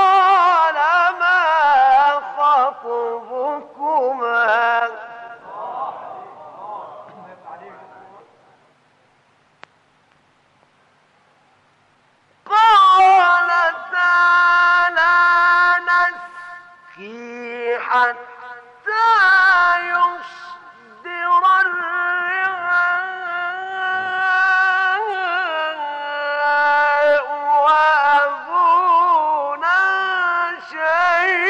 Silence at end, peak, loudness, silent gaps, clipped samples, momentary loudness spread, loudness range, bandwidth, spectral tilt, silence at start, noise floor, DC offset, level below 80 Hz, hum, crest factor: 0 s; -6 dBFS; -16 LUFS; none; under 0.1%; 21 LU; 8 LU; 10 kHz; -1.5 dB/octave; 0 s; -58 dBFS; under 0.1%; -68 dBFS; none; 12 dB